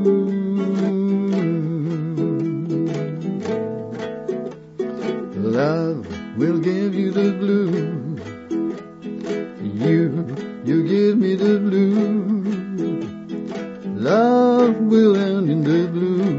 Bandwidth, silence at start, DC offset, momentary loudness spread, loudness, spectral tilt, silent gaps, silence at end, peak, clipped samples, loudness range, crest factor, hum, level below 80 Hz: 7.6 kHz; 0 s; under 0.1%; 13 LU; -20 LUFS; -8.5 dB/octave; none; 0 s; -4 dBFS; under 0.1%; 6 LU; 16 dB; none; -62 dBFS